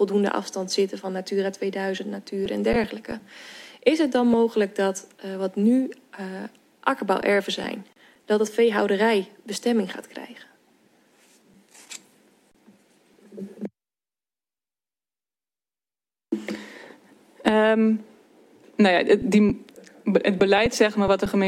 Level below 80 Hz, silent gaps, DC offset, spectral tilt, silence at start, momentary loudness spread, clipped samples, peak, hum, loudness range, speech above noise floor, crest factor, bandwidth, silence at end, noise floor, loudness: -52 dBFS; none; under 0.1%; -5 dB/octave; 0 s; 19 LU; under 0.1%; -2 dBFS; none; 22 LU; over 67 dB; 22 dB; 14.5 kHz; 0 s; under -90 dBFS; -23 LUFS